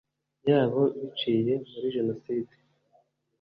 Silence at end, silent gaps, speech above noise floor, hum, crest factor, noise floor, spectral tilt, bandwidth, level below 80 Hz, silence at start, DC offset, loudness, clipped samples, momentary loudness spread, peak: 0.95 s; none; 40 dB; none; 20 dB; -67 dBFS; -9.5 dB/octave; 5.2 kHz; -68 dBFS; 0.45 s; under 0.1%; -28 LUFS; under 0.1%; 10 LU; -10 dBFS